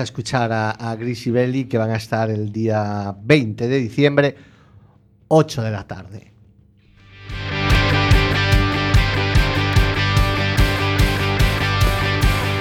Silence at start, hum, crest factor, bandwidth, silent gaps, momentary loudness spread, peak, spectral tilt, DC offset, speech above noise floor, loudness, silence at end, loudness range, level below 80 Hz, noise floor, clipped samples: 0 s; none; 18 dB; 17.5 kHz; none; 9 LU; 0 dBFS; -6 dB/octave; under 0.1%; 32 dB; -18 LUFS; 0 s; 5 LU; -26 dBFS; -51 dBFS; under 0.1%